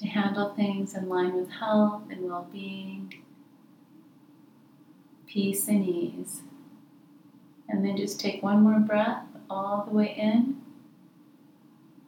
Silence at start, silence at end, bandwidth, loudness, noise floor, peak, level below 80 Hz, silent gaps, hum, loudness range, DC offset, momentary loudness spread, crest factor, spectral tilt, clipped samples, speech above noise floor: 0 s; 1.35 s; 18.5 kHz; -28 LUFS; -56 dBFS; -12 dBFS; -90 dBFS; none; none; 9 LU; under 0.1%; 15 LU; 18 dB; -5.5 dB/octave; under 0.1%; 30 dB